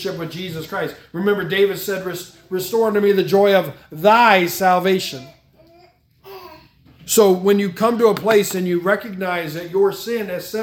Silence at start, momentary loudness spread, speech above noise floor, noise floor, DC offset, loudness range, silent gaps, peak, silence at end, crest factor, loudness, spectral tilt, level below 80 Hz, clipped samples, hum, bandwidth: 0 s; 14 LU; 35 dB; -52 dBFS; under 0.1%; 4 LU; none; 0 dBFS; 0 s; 18 dB; -18 LUFS; -4.5 dB/octave; -60 dBFS; under 0.1%; none; 18 kHz